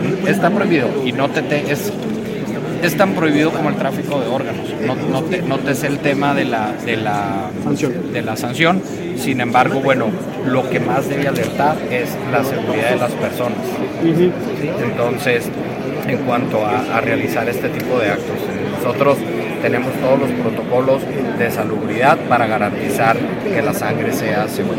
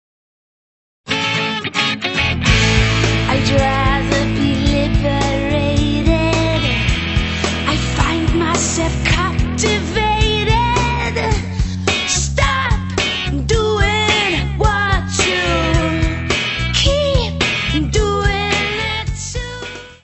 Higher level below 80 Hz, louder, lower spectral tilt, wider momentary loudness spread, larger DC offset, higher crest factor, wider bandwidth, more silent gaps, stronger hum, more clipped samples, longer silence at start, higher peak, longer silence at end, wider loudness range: second, -50 dBFS vs -24 dBFS; about the same, -17 LUFS vs -16 LUFS; first, -6 dB/octave vs -4.5 dB/octave; first, 7 LU vs 4 LU; neither; about the same, 18 dB vs 16 dB; first, 17 kHz vs 8.4 kHz; neither; neither; neither; second, 0 s vs 1.05 s; about the same, 0 dBFS vs 0 dBFS; about the same, 0 s vs 0.1 s; about the same, 2 LU vs 2 LU